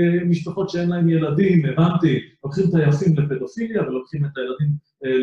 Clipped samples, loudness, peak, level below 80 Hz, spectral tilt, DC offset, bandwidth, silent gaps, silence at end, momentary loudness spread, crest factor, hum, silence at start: under 0.1%; -20 LUFS; -6 dBFS; -56 dBFS; -8.5 dB/octave; under 0.1%; 7.4 kHz; none; 0 s; 8 LU; 14 dB; none; 0 s